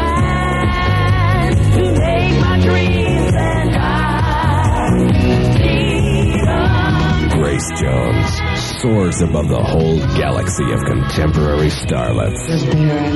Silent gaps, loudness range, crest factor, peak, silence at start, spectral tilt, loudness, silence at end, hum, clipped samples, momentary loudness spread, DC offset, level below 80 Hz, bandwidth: none; 2 LU; 12 dB; -2 dBFS; 0 s; -6 dB/octave; -15 LUFS; 0 s; none; under 0.1%; 4 LU; under 0.1%; -22 dBFS; 12 kHz